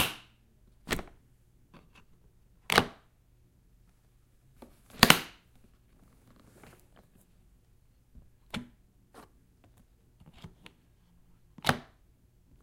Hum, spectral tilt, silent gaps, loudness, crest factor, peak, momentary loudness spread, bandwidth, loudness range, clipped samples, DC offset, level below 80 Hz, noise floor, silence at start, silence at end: none; -2.5 dB/octave; none; -28 LUFS; 36 dB; 0 dBFS; 31 LU; 16 kHz; 22 LU; under 0.1%; under 0.1%; -56 dBFS; -64 dBFS; 0 s; 0.8 s